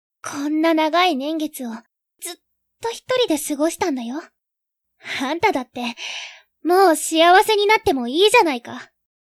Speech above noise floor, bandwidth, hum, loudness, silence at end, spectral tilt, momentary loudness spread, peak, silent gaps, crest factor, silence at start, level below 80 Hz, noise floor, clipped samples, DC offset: 62 dB; 15.5 kHz; none; -18 LUFS; 0.4 s; -2 dB/octave; 19 LU; 0 dBFS; none; 20 dB; 0.25 s; -58 dBFS; -81 dBFS; under 0.1%; under 0.1%